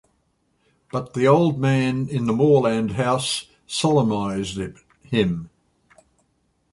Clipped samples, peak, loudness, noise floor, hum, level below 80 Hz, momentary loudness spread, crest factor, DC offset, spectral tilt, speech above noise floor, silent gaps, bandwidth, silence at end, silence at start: under 0.1%; -4 dBFS; -21 LUFS; -67 dBFS; none; -52 dBFS; 12 LU; 18 dB; under 0.1%; -6 dB/octave; 47 dB; none; 11.5 kHz; 1.25 s; 0.95 s